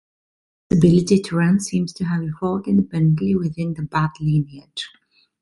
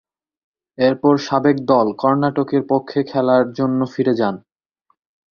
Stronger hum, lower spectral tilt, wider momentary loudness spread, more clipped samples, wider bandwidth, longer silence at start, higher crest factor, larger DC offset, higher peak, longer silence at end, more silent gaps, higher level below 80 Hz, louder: neither; about the same, -7 dB/octave vs -7.5 dB/octave; first, 13 LU vs 4 LU; neither; first, 11.5 kHz vs 6.8 kHz; about the same, 0.7 s vs 0.8 s; about the same, 18 dB vs 16 dB; neither; about the same, -2 dBFS vs -2 dBFS; second, 0.55 s vs 0.9 s; neither; first, -48 dBFS vs -60 dBFS; second, -20 LUFS vs -17 LUFS